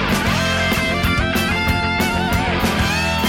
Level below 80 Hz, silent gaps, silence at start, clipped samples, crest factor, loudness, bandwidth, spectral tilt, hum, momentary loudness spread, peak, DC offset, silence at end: -28 dBFS; none; 0 s; under 0.1%; 12 dB; -17 LUFS; 17 kHz; -4.5 dB/octave; none; 1 LU; -6 dBFS; under 0.1%; 0 s